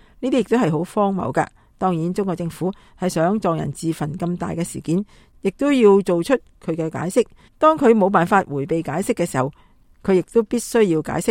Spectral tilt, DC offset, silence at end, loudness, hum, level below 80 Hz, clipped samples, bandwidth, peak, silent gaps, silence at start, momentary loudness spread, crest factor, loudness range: -6.5 dB/octave; under 0.1%; 0 s; -20 LUFS; none; -50 dBFS; under 0.1%; 16.5 kHz; -2 dBFS; none; 0.2 s; 11 LU; 18 dB; 5 LU